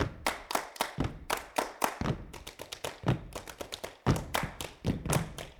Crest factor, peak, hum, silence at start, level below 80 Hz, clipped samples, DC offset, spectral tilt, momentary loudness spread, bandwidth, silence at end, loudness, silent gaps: 26 dB; -8 dBFS; none; 0 s; -48 dBFS; under 0.1%; under 0.1%; -4.5 dB/octave; 10 LU; 19.5 kHz; 0 s; -35 LUFS; none